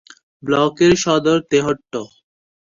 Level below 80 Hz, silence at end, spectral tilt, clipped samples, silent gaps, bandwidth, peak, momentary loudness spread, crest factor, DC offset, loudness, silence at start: -50 dBFS; 0.65 s; -4.5 dB/octave; under 0.1%; none; 7.6 kHz; -2 dBFS; 15 LU; 16 dB; under 0.1%; -16 LUFS; 0.45 s